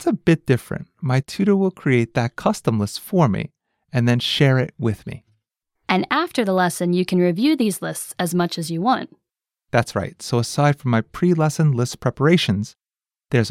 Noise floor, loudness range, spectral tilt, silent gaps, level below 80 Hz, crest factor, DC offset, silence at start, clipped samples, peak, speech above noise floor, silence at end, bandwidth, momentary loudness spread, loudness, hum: under -90 dBFS; 2 LU; -6 dB/octave; none; -54 dBFS; 18 dB; under 0.1%; 0 s; under 0.1%; -2 dBFS; over 71 dB; 0 s; 16 kHz; 9 LU; -20 LUFS; none